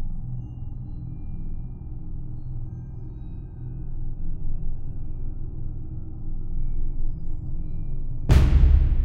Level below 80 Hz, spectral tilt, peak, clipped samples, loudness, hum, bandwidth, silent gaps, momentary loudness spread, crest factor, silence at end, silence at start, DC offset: -26 dBFS; -8 dB/octave; -6 dBFS; under 0.1%; -30 LUFS; none; 7 kHz; none; 17 LU; 18 dB; 0 s; 0 s; under 0.1%